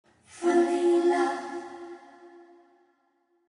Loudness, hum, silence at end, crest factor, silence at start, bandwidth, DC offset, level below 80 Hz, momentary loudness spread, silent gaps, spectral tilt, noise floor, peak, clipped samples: -25 LUFS; none; 1.25 s; 18 dB; 0.35 s; 10.5 kHz; under 0.1%; -80 dBFS; 21 LU; none; -3.5 dB/octave; -71 dBFS; -12 dBFS; under 0.1%